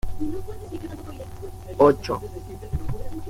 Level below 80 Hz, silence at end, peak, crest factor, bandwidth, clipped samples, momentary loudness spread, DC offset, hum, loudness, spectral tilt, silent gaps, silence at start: -38 dBFS; 0 s; -4 dBFS; 22 dB; 16 kHz; under 0.1%; 19 LU; under 0.1%; none; -25 LUFS; -7.5 dB/octave; none; 0.05 s